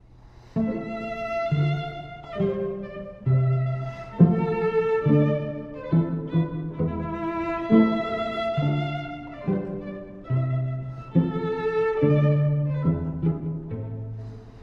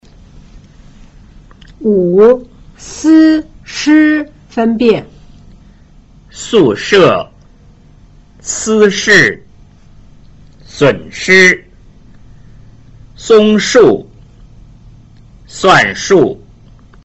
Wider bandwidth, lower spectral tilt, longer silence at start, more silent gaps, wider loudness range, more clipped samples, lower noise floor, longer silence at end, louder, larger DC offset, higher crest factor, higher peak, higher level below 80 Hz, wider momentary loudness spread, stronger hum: second, 5.8 kHz vs 8.2 kHz; first, -10 dB/octave vs -4.5 dB/octave; second, 0.25 s vs 0.55 s; neither; about the same, 4 LU vs 4 LU; neither; first, -49 dBFS vs -41 dBFS; second, 0 s vs 0.7 s; second, -25 LUFS vs -9 LUFS; neither; first, 20 dB vs 12 dB; second, -4 dBFS vs 0 dBFS; second, -48 dBFS vs -40 dBFS; second, 14 LU vs 17 LU; neither